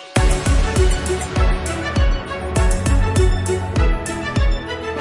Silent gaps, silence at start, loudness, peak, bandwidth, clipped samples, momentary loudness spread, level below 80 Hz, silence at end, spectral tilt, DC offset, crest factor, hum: none; 0 s; -19 LUFS; -4 dBFS; 11.5 kHz; under 0.1%; 5 LU; -20 dBFS; 0 s; -5.5 dB/octave; under 0.1%; 14 dB; none